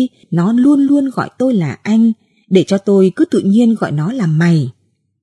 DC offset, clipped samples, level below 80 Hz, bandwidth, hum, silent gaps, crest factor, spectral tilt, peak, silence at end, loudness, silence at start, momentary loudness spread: under 0.1%; under 0.1%; -62 dBFS; 11.5 kHz; none; none; 12 dB; -8 dB/octave; 0 dBFS; 0.5 s; -13 LUFS; 0 s; 6 LU